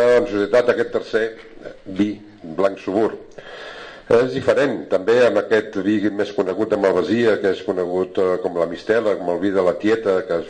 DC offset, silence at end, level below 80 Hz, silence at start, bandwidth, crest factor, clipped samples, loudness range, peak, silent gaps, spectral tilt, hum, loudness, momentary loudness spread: under 0.1%; 0 s; -54 dBFS; 0 s; 9.6 kHz; 16 dB; under 0.1%; 5 LU; -4 dBFS; none; -6 dB/octave; none; -19 LUFS; 17 LU